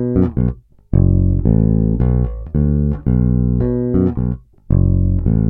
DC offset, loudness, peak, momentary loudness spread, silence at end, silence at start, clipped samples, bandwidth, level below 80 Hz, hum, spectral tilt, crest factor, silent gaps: under 0.1%; -16 LUFS; 0 dBFS; 7 LU; 0 s; 0 s; under 0.1%; 2.4 kHz; -22 dBFS; none; -14.5 dB/octave; 14 dB; none